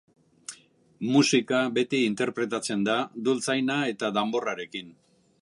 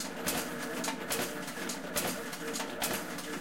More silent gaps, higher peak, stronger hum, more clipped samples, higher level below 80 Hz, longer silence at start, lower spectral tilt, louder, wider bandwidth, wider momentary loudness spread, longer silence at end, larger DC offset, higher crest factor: neither; first, -8 dBFS vs -16 dBFS; neither; neither; second, -74 dBFS vs -64 dBFS; first, 0.5 s vs 0 s; first, -4 dB/octave vs -2.5 dB/octave; first, -26 LUFS vs -35 LUFS; second, 11.5 kHz vs 17 kHz; first, 16 LU vs 4 LU; first, 0.5 s vs 0 s; second, under 0.1% vs 0.3%; about the same, 18 dB vs 20 dB